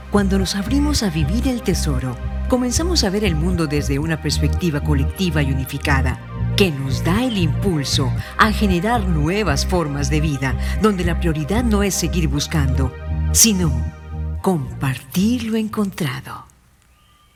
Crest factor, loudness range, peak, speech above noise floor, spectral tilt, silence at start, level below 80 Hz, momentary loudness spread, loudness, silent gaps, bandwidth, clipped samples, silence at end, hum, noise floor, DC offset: 18 dB; 2 LU; 0 dBFS; 35 dB; -4.5 dB/octave; 0 s; -26 dBFS; 7 LU; -19 LUFS; none; 19 kHz; under 0.1%; 0.95 s; none; -53 dBFS; under 0.1%